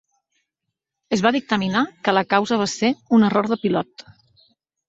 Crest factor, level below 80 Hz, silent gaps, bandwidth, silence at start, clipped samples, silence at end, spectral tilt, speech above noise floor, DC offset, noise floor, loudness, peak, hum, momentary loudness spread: 20 dB; -62 dBFS; none; 8 kHz; 1.1 s; under 0.1%; 0.85 s; -5 dB/octave; 62 dB; under 0.1%; -81 dBFS; -20 LUFS; -2 dBFS; none; 6 LU